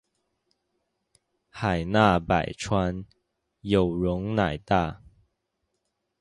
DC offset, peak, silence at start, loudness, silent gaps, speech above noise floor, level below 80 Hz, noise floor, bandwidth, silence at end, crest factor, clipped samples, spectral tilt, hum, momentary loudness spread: under 0.1%; -4 dBFS; 1.55 s; -25 LUFS; none; 54 dB; -46 dBFS; -78 dBFS; 11.5 kHz; 1.25 s; 22 dB; under 0.1%; -6.5 dB/octave; none; 10 LU